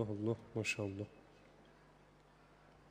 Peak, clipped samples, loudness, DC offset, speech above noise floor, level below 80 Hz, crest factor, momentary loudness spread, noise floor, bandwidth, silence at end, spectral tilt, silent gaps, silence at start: -24 dBFS; under 0.1%; -41 LUFS; under 0.1%; 25 dB; -72 dBFS; 20 dB; 25 LU; -65 dBFS; 15.5 kHz; 0 s; -5.5 dB/octave; none; 0 s